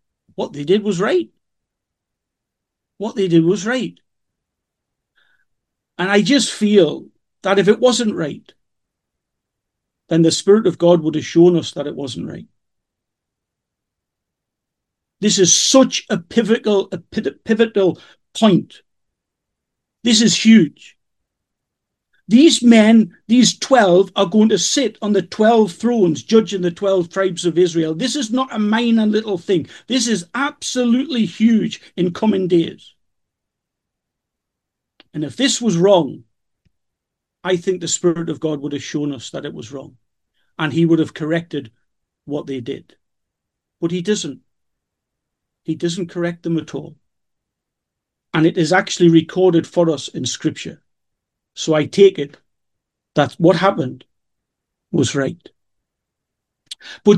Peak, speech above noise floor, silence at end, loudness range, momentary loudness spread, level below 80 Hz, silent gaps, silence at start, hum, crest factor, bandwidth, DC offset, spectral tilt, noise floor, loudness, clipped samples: 0 dBFS; 65 dB; 0 s; 11 LU; 15 LU; -64 dBFS; none; 0.4 s; none; 18 dB; 12 kHz; under 0.1%; -4.5 dB/octave; -81 dBFS; -16 LUFS; under 0.1%